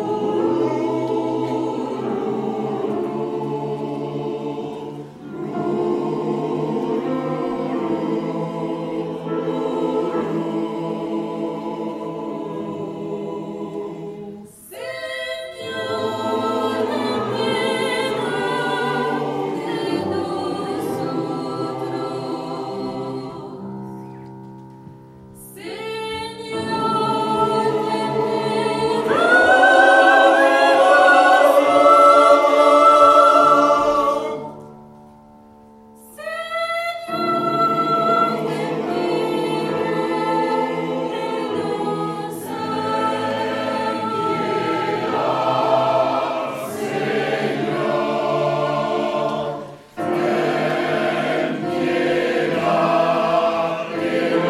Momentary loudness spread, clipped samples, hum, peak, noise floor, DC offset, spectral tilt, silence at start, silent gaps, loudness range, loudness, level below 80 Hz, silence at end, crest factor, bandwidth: 16 LU; under 0.1%; none; -2 dBFS; -46 dBFS; under 0.1%; -5.5 dB/octave; 0 s; none; 15 LU; -19 LUFS; -60 dBFS; 0 s; 18 dB; 15.5 kHz